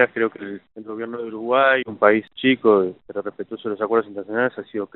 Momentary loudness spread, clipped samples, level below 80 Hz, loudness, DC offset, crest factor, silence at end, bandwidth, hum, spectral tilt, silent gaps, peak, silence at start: 15 LU; under 0.1%; -70 dBFS; -21 LUFS; under 0.1%; 22 dB; 0.1 s; 4.2 kHz; none; -3 dB/octave; none; 0 dBFS; 0 s